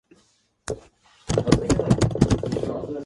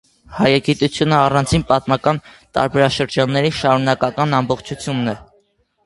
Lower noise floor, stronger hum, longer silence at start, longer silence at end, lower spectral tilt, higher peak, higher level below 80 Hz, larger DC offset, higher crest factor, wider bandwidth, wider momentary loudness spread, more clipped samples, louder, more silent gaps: about the same, -63 dBFS vs -60 dBFS; neither; first, 0.65 s vs 0.3 s; second, 0 s vs 0.6 s; about the same, -6.5 dB/octave vs -5.5 dB/octave; about the same, 0 dBFS vs 0 dBFS; about the same, -38 dBFS vs -42 dBFS; neither; first, 24 dB vs 18 dB; about the same, 11.5 kHz vs 11.5 kHz; first, 15 LU vs 9 LU; neither; second, -22 LUFS vs -17 LUFS; neither